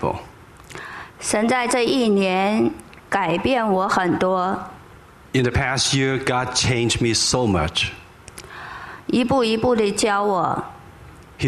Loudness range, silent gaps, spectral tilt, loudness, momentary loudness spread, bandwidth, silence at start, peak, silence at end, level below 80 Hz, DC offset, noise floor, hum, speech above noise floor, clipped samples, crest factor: 2 LU; none; -4 dB/octave; -20 LUFS; 17 LU; 13.5 kHz; 0 s; -4 dBFS; 0 s; -44 dBFS; under 0.1%; -45 dBFS; none; 26 dB; under 0.1%; 18 dB